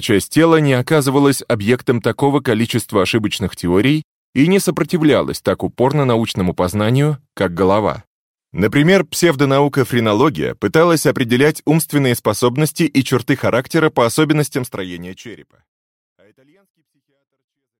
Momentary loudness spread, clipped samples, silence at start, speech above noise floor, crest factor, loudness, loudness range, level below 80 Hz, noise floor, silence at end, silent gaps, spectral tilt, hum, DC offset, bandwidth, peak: 8 LU; under 0.1%; 0 s; 52 dB; 14 dB; -15 LUFS; 4 LU; -48 dBFS; -67 dBFS; 2.45 s; 4.04-4.33 s, 8.07-8.35 s; -5.5 dB/octave; none; under 0.1%; 17 kHz; -2 dBFS